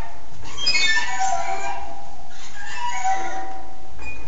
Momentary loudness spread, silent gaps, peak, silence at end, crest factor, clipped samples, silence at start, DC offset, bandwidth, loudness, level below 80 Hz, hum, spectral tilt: 22 LU; none; -6 dBFS; 0 s; 18 dB; under 0.1%; 0 s; 20%; 8 kHz; -23 LUFS; -46 dBFS; none; 0.5 dB/octave